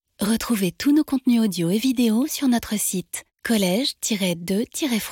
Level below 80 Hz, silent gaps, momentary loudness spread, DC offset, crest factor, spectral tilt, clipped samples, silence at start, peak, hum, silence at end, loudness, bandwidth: -54 dBFS; none; 5 LU; under 0.1%; 14 dB; -4 dB/octave; under 0.1%; 0.2 s; -8 dBFS; none; 0 s; -22 LUFS; 17 kHz